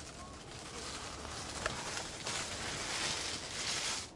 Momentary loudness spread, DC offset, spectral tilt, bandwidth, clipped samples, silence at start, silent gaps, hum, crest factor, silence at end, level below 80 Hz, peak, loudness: 11 LU; under 0.1%; -1.5 dB/octave; 11.5 kHz; under 0.1%; 0 s; none; none; 22 dB; 0 s; -58 dBFS; -18 dBFS; -38 LUFS